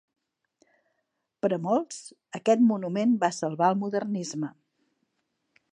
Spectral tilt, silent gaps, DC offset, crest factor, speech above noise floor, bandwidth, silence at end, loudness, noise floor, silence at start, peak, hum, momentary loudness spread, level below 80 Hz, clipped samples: -6 dB/octave; none; under 0.1%; 20 dB; 54 dB; 10 kHz; 1.2 s; -26 LUFS; -79 dBFS; 1.45 s; -10 dBFS; none; 14 LU; -82 dBFS; under 0.1%